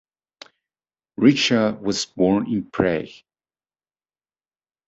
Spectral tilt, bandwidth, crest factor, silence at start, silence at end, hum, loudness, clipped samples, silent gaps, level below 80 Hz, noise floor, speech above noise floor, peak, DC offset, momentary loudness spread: -5 dB/octave; 8.2 kHz; 22 dB; 1.2 s; 1.75 s; none; -20 LUFS; under 0.1%; none; -54 dBFS; under -90 dBFS; over 70 dB; -2 dBFS; under 0.1%; 11 LU